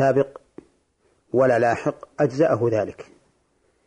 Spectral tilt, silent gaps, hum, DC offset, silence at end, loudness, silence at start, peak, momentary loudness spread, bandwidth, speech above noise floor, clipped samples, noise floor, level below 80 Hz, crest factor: -7.5 dB/octave; none; none; under 0.1%; 0.85 s; -22 LUFS; 0 s; -8 dBFS; 10 LU; 10 kHz; 45 dB; under 0.1%; -66 dBFS; -62 dBFS; 14 dB